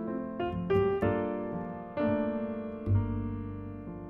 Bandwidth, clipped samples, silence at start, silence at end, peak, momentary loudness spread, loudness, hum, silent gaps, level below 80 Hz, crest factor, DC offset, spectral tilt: 4.4 kHz; under 0.1%; 0 s; 0 s; -14 dBFS; 10 LU; -32 LUFS; none; none; -48 dBFS; 16 dB; under 0.1%; -10.5 dB/octave